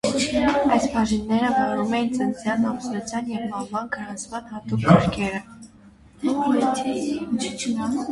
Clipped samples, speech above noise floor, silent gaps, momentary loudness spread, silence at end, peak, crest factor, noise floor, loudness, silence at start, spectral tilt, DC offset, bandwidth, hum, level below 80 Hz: under 0.1%; 27 dB; none; 10 LU; 0 s; -2 dBFS; 22 dB; -50 dBFS; -23 LUFS; 0.05 s; -5.5 dB/octave; under 0.1%; 11.5 kHz; none; -48 dBFS